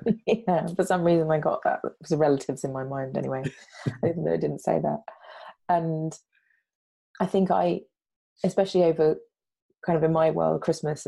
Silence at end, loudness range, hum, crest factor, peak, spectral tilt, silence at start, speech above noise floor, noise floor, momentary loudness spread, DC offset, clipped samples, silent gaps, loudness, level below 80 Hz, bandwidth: 0.05 s; 4 LU; none; 16 dB; -10 dBFS; -7 dB/octave; 0 s; 22 dB; -47 dBFS; 12 LU; under 0.1%; under 0.1%; 6.75-7.14 s, 8.16-8.36 s, 9.62-9.69 s; -26 LUFS; -62 dBFS; 12.5 kHz